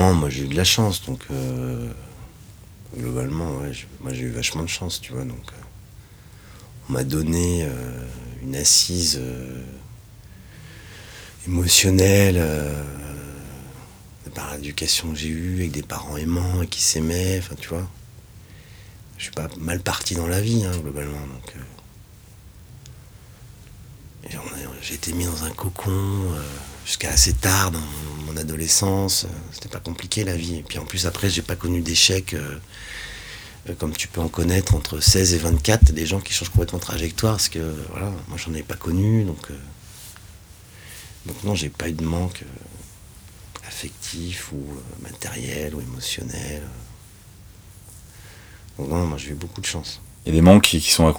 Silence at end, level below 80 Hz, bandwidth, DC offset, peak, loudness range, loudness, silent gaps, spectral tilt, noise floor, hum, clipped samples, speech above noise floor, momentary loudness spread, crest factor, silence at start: 0 s; -34 dBFS; over 20 kHz; under 0.1%; 0 dBFS; 12 LU; -22 LUFS; none; -4 dB/octave; -46 dBFS; none; under 0.1%; 24 dB; 24 LU; 24 dB; 0 s